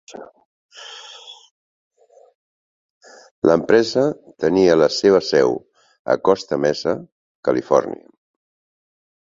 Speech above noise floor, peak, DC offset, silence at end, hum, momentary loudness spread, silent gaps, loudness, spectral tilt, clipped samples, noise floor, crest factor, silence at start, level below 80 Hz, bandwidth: over 73 dB; -2 dBFS; under 0.1%; 1.4 s; none; 22 LU; 0.45-0.69 s, 1.51-1.91 s, 2.35-3.01 s, 3.31-3.42 s, 5.99-6.05 s, 7.12-7.43 s; -18 LUFS; -5 dB/octave; under 0.1%; under -90 dBFS; 20 dB; 0.1 s; -58 dBFS; 7.8 kHz